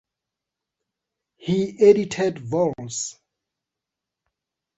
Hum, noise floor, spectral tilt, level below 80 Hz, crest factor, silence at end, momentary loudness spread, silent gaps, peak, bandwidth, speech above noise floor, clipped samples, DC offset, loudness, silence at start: none; -86 dBFS; -5.5 dB/octave; -62 dBFS; 22 dB; 1.65 s; 13 LU; none; -4 dBFS; 8.2 kHz; 66 dB; under 0.1%; under 0.1%; -21 LUFS; 1.45 s